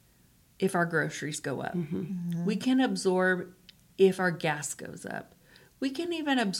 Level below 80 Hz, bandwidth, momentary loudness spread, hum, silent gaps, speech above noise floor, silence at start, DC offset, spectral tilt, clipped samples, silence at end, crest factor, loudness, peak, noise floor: -70 dBFS; 16.5 kHz; 13 LU; none; none; 34 dB; 0.6 s; under 0.1%; -5 dB/octave; under 0.1%; 0 s; 18 dB; -30 LUFS; -12 dBFS; -62 dBFS